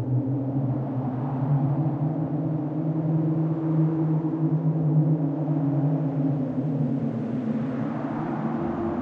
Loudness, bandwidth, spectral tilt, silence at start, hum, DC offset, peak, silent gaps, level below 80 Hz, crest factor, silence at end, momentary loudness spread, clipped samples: -26 LUFS; 3.5 kHz; -12 dB/octave; 0 s; none; under 0.1%; -12 dBFS; none; -58 dBFS; 12 dB; 0 s; 5 LU; under 0.1%